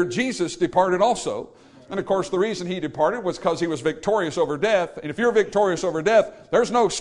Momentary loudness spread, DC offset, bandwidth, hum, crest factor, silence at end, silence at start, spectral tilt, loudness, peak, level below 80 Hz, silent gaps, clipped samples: 9 LU; under 0.1%; 11 kHz; none; 16 dB; 0 s; 0 s; -4.5 dB/octave; -22 LUFS; -6 dBFS; -56 dBFS; none; under 0.1%